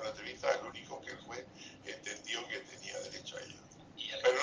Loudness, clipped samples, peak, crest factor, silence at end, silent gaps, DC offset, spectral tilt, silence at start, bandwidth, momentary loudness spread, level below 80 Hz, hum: -40 LUFS; under 0.1%; -16 dBFS; 24 dB; 0 s; none; under 0.1%; -2 dB/octave; 0 s; 10 kHz; 13 LU; -72 dBFS; none